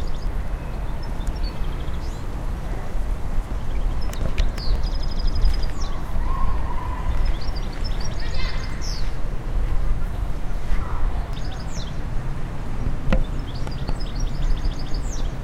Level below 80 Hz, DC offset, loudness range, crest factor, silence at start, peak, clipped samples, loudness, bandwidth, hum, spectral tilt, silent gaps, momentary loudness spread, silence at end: -24 dBFS; under 0.1%; 3 LU; 18 dB; 0 s; -4 dBFS; under 0.1%; -29 LUFS; 8.8 kHz; none; -5.5 dB/octave; none; 5 LU; 0 s